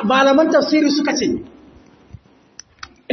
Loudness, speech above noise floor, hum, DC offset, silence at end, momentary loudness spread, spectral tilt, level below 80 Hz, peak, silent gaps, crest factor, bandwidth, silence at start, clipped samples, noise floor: -16 LUFS; 31 dB; none; under 0.1%; 0 s; 20 LU; -4 dB/octave; -54 dBFS; -2 dBFS; none; 16 dB; 6.4 kHz; 0 s; under 0.1%; -46 dBFS